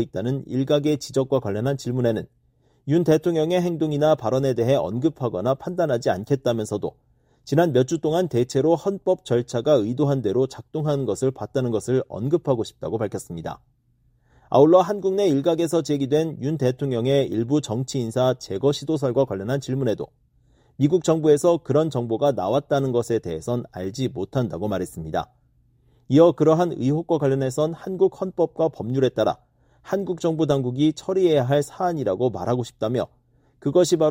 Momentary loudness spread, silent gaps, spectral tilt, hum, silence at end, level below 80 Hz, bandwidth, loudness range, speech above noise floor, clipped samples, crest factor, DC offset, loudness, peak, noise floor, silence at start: 9 LU; none; -7 dB/octave; none; 0 s; -56 dBFS; 16 kHz; 3 LU; 41 dB; under 0.1%; 18 dB; under 0.1%; -22 LUFS; -4 dBFS; -63 dBFS; 0 s